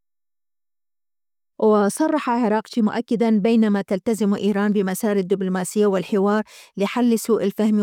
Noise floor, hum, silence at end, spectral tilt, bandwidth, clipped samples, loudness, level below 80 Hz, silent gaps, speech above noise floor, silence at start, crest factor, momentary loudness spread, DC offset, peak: under -90 dBFS; none; 0 s; -6 dB/octave; 16.5 kHz; under 0.1%; -20 LUFS; -70 dBFS; none; over 71 dB; 1.6 s; 12 dB; 5 LU; under 0.1%; -8 dBFS